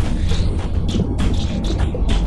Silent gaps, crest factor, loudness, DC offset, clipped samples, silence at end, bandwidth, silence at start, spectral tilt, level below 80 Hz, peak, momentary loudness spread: none; 14 dB; -21 LUFS; under 0.1%; under 0.1%; 0 s; 11.5 kHz; 0 s; -6.5 dB/octave; -20 dBFS; -4 dBFS; 2 LU